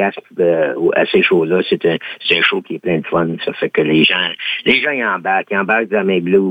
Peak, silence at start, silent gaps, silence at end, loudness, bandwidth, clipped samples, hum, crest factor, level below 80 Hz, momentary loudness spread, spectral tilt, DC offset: 0 dBFS; 0 s; none; 0 s; -15 LUFS; 5 kHz; under 0.1%; none; 14 dB; -56 dBFS; 7 LU; -7 dB/octave; under 0.1%